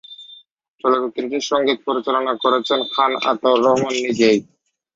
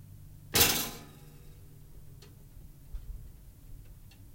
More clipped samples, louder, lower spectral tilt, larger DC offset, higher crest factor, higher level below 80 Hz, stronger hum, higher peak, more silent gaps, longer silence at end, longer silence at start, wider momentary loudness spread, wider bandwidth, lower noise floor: neither; first, -18 LUFS vs -26 LUFS; first, -4 dB/octave vs -1.5 dB/octave; neither; second, 18 dB vs 28 dB; second, -64 dBFS vs -50 dBFS; neither; first, -2 dBFS vs -10 dBFS; first, 0.70-0.74 s vs none; first, 0.5 s vs 0 s; about the same, 0.1 s vs 0 s; second, 8 LU vs 29 LU; second, 7.8 kHz vs 16.5 kHz; about the same, -49 dBFS vs -51 dBFS